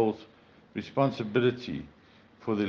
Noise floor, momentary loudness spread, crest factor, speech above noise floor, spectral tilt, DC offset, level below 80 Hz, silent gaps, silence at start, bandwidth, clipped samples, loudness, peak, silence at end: -56 dBFS; 14 LU; 18 dB; 27 dB; -8 dB/octave; under 0.1%; -66 dBFS; none; 0 s; 7 kHz; under 0.1%; -30 LUFS; -12 dBFS; 0 s